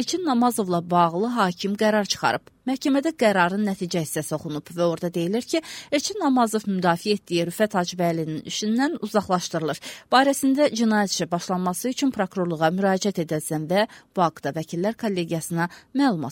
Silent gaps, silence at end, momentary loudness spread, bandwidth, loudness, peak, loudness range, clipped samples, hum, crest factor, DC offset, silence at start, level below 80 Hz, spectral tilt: none; 0 s; 7 LU; 17 kHz; -23 LUFS; -4 dBFS; 2 LU; under 0.1%; none; 20 dB; under 0.1%; 0 s; -64 dBFS; -4.5 dB/octave